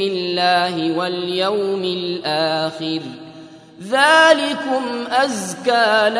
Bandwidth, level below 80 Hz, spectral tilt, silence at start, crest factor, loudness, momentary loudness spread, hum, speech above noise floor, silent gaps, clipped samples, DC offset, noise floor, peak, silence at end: 11 kHz; -68 dBFS; -3.5 dB/octave; 0 s; 18 dB; -17 LUFS; 11 LU; none; 22 dB; none; under 0.1%; under 0.1%; -40 dBFS; 0 dBFS; 0 s